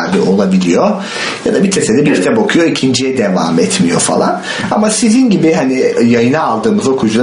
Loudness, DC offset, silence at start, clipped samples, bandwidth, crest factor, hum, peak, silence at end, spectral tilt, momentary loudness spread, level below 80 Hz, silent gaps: -11 LUFS; under 0.1%; 0 s; under 0.1%; 11 kHz; 10 dB; none; 0 dBFS; 0 s; -5 dB/octave; 4 LU; -48 dBFS; none